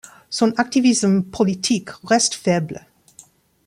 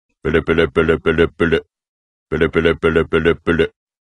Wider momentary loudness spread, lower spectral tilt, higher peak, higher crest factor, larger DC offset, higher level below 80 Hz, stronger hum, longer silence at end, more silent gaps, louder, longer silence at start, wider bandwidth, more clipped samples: first, 9 LU vs 4 LU; second, -4 dB/octave vs -7.5 dB/octave; about the same, -2 dBFS vs 0 dBFS; about the same, 18 dB vs 16 dB; neither; second, -58 dBFS vs -34 dBFS; neither; first, 0.9 s vs 0.45 s; second, none vs 1.89-2.26 s; about the same, -19 LUFS vs -17 LUFS; about the same, 0.3 s vs 0.25 s; first, 13.5 kHz vs 10.5 kHz; neither